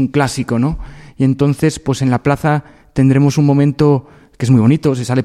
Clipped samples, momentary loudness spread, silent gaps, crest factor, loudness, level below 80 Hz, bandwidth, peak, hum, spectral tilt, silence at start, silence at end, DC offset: under 0.1%; 8 LU; none; 12 dB; -14 LUFS; -38 dBFS; 13 kHz; 0 dBFS; none; -7 dB/octave; 0 s; 0 s; under 0.1%